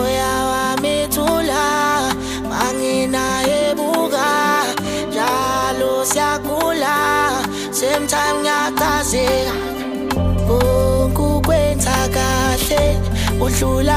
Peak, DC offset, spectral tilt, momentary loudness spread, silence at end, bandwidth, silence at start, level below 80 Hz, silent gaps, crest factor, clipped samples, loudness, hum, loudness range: -2 dBFS; under 0.1%; -4 dB/octave; 4 LU; 0 s; 15.5 kHz; 0 s; -28 dBFS; none; 14 dB; under 0.1%; -17 LUFS; none; 1 LU